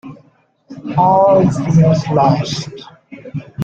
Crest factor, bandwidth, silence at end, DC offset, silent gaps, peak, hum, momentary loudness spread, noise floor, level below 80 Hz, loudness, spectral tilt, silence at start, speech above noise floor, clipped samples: 14 dB; 8 kHz; 0 s; under 0.1%; none; -2 dBFS; none; 18 LU; -53 dBFS; -46 dBFS; -13 LUFS; -7.5 dB/octave; 0.05 s; 40 dB; under 0.1%